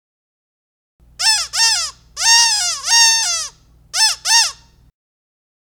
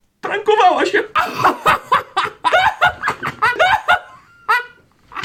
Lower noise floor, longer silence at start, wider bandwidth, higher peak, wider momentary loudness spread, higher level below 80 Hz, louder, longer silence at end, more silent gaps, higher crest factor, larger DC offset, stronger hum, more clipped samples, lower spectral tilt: second, -37 dBFS vs -44 dBFS; first, 1.2 s vs 0.25 s; first, 19.5 kHz vs 17.5 kHz; about the same, 0 dBFS vs -2 dBFS; first, 11 LU vs 8 LU; about the same, -52 dBFS vs -50 dBFS; first, -13 LUFS vs -16 LUFS; first, 1.2 s vs 0 s; neither; about the same, 18 dB vs 16 dB; neither; first, 60 Hz at -60 dBFS vs none; neither; second, 4.5 dB/octave vs -3.5 dB/octave